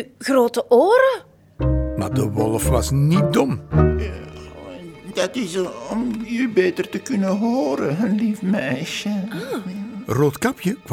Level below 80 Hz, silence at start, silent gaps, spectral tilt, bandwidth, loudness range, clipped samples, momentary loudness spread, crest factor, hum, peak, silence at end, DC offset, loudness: -34 dBFS; 0 s; none; -6 dB/octave; 18 kHz; 5 LU; under 0.1%; 13 LU; 18 dB; none; -2 dBFS; 0 s; under 0.1%; -20 LUFS